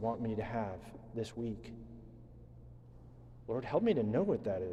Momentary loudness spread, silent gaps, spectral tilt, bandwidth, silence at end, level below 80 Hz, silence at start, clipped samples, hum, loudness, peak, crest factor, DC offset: 24 LU; none; -8 dB/octave; 11.5 kHz; 0 s; -58 dBFS; 0 s; under 0.1%; none; -36 LUFS; -20 dBFS; 18 dB; under 0.1%